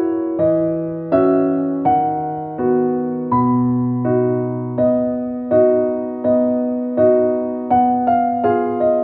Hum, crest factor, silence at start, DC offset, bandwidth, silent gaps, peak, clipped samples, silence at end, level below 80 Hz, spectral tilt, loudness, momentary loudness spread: none; 14 dB; 0 s; under 0.1%; 3.3 kHz; none; -2 dBFS; under 0.1%; 0 s; -52 dBFS; -13 dB/octave; -17 LUFS; 6 LU